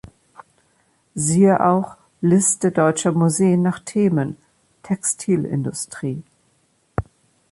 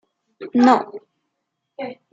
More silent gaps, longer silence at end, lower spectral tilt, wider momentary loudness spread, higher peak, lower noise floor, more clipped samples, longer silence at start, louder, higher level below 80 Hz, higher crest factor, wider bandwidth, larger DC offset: neither; first, 0.5 s vs 0.2 s; about the same, -6 dB/octave vs -5.5 dB/octave; second, 14 LU vs 23 LU; about the same, -2 dBFS vs -2 dBFS; second, -63 dBFS vs -77 dBFS; neither; first, 1.15 s vs 0.4 s; about the same, -19 LUFS vs -17 LUFS; first, -50 dBFS vs -74 dBFS; about the same, 18 dB vs 20 dB; first, 11.5 kHz vs 7.8 kHz; neither